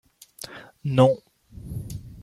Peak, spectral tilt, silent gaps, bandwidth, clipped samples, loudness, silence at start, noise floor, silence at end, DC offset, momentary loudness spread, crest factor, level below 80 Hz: -6 dBFS; -7 dB/octave; none; 16 kHz; under 0.1%; -23 LUFS; 0.4 s; -44 dBFS; 0 s; under 0.1%; 21 LU; 20 dB; -50 dBFS